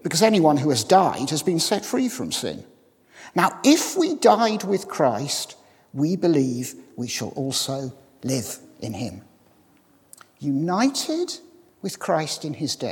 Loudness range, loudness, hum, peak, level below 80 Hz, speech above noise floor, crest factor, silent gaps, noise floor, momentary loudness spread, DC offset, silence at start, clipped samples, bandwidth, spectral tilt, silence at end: 8 LU; -22 LUFS; none; -2 dBFS; -70 dBFS; 36 dB; 22 dB; none; -58 dBFS; 16 LU; under 0.1%; 0.05 s; under 0.1%; 18 kHz; -4.5 dB/octave; 0 s